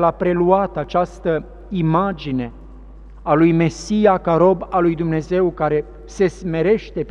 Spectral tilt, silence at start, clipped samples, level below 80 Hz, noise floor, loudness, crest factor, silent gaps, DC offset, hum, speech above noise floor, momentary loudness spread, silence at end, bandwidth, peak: -7.5 dB/octave; 0 s; under 0.1%; -40 dBFS; -38 dBFS; -18 LUFS; 18 dB; none; under 0.1%; none; 21 dB; 9 LU; 0 s; 9.6 kHz; 0 dBFS